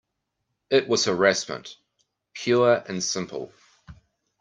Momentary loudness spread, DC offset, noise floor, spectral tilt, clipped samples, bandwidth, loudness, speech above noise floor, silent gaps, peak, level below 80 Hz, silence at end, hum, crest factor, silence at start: 18 LU; under 0.1%; -79 dBFS; -3.5 dB/octave; under 0.1%; 10 kHz; -23 LUFS; 56 dB; none; -4 dBFS; -64 dBFS; 0.5 s; none; 22 dB; 0.7 s